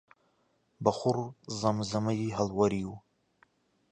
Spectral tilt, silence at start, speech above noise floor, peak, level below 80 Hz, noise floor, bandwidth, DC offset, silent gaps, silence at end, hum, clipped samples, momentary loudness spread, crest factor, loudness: -6.5 dB/octave; 0.8 s; 42 dB; -10 dBFS; -60 dBFS; -72 dBFS; 10 kHz; under 0.1%; none; 0.9 s; none; under 0.1%; 9 LU; 24 dB; -31 LUFS